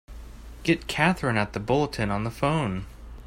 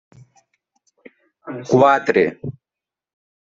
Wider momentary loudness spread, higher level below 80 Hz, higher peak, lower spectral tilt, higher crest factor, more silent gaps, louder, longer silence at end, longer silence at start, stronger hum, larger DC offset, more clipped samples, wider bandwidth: about the same, 21 LU vs 20 LU; first, -42 dBFS vs -64 dBFS; second, -6 dBFS vs -2 dBFS; about the same, -6 dB/octave vs -6.5 dB/octave; about the same, 20 dB vs 20 dB; neither; second, -26 LUFS vs -16 LUFS; second, 0 s vs 1.05 s; second, 0.1 s vs 1.45 s; neither; neither; neither; first, 16 kHz vs 7.6 kHz